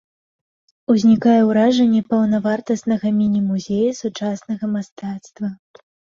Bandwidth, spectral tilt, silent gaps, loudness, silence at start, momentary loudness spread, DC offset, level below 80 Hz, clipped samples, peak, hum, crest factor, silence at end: 7.4 kHz; -6.5 dB/octave; 4.92-4.96 s; -18 LUFS; 0.9 s; 15 LU; under 0.1%; -60 dBFS; under 0.1%; -4 dBFS; none; 14 dB; 0.6 s